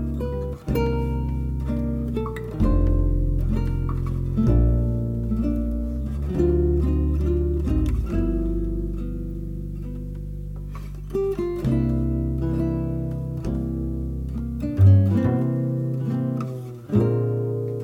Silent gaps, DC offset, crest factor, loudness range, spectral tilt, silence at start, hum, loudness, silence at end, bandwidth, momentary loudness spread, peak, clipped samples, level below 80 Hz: none; under 0.1%; 16 dB; 6 LU; -10 dB/octave; 0 s; none; -24 LUFS; 0 s; 15 kHz; 11 LU; -6 dBFS; under 0.1%; -28 dBFS